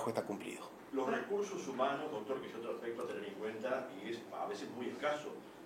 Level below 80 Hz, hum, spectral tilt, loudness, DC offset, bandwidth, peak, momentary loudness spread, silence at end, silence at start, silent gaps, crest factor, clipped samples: -82 dBFS; none; -4.5 dB/octave; -41 LUFS; under 0.1%; 16.5 kHz; -20 dBFS; 7 LU; 0 s; 0 s; none; 20 dB; under 0.1%